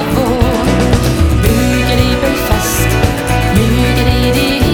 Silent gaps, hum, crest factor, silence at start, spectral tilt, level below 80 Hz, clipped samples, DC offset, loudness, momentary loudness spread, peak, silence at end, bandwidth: none; none; 10 dB; 0 s; -5.5 dB/octave; -18 dBFS; under 0.1%; under 0.1%; -12 LUFS; 2 LU; 0 dBFS; 0 s; 19 kHz